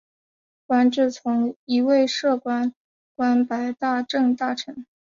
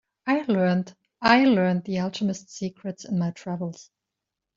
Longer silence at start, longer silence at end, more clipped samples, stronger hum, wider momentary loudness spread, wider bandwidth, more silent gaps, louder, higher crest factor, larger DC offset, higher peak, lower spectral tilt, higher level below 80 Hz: first, 0.7 s vs 0.25 s; second, 0.2 s vs 0.75 s; neither; neither; second, 7 LU vs 15 LU; about the same, 7.4 kHz vs 7.6 kHz; first, 1.56-1.67 s, 2.76-3.15 s vs none; about the same, -22 LUFS vs -24 LUFS; second, 14 dB vs 22 dB; neither; second, -8 dBFS vs -4 dBFS; second, -4 dB/octave vs -6 dB/octave; second, -70 dBFS vs -62 dBFS